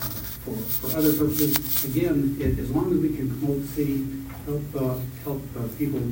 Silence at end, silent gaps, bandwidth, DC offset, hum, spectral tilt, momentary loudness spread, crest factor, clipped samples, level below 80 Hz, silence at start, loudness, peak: 0 s; none; 16.5 kHz; under 0.1%; none; -6 dB/octave; 11 LU; 24 dB; under 0.1%; -42 dBFS; 0 s; -25 LUFS; 0 dBFS